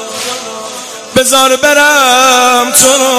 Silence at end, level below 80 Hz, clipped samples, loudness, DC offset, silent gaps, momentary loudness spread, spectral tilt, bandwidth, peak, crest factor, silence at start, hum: 0 s; -48 dBFS; 0.8%; -7 LUFS; under 0.1%; none; 16 LU; -0.5 dB/octave; 16 kHz; 0 dBFS; 8 dB; 0 s; none